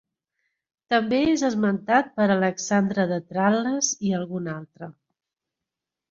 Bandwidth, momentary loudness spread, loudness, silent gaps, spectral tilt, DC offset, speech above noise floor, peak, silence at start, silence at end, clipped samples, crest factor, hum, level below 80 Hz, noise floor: 7.8 kHz; 12 LU; -23 LUFS; none; -4.5 dB/octave; under 0.1%; 64 dB; -6 dBFS; 0.9 s; 1.2 s; under 0.1%; 20 dB; none; -62 dBFS; -87 dBFS